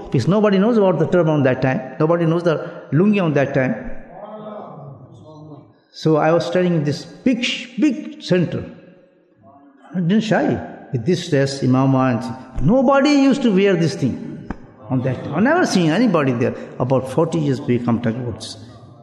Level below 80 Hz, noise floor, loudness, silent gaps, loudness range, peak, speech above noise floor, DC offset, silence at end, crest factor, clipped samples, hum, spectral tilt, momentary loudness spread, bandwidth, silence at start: -42 dBFS; -52 dBFS; -18 LUFS; none; 5 LU; -2 dBFS; 35 dB; under 0.1%; 0.15 s; 16 dB; under 0.1%; none; -7 dB/octave; 17 LU; 11.5 kHz; 0 s